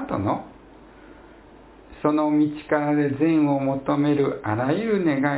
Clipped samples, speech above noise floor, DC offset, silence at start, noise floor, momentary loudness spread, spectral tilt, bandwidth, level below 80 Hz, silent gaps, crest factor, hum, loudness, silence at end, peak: under 0.1%; 26 dB; under 0.1%; 0 s; -48 dBFS; 5 LU; -11.5 dB/octave; 4 kHz; -54 dBFS; none; 16 dB; none; -22 LUFS; 0 s; -6 dBFS